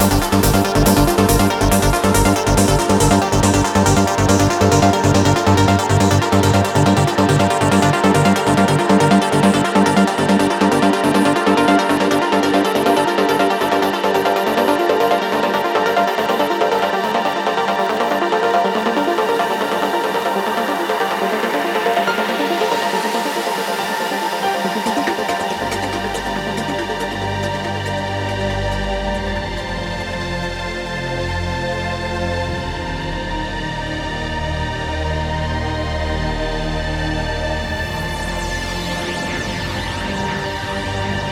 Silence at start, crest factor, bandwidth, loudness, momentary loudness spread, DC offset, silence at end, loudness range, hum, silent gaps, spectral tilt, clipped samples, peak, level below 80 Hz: 0 s; 16 dB; 19 kHz; -17 LUFS; 9 LU; under 0.1%; 0 s; 8 LU; none; none; -5 dB/octave; under 0.1%; 0 dBFS; -30 dBFS